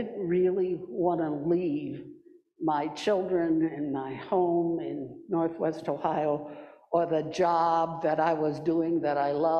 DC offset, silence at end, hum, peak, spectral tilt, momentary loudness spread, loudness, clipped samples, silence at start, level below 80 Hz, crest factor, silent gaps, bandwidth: under 0.1%; 0 s; none; -12 dBFS; -7.5 dB/octave; 8 LU; -28 LUFS; under 0.1%; 0 s; -68 dBFS; 16 dB; none; 8.4 kHz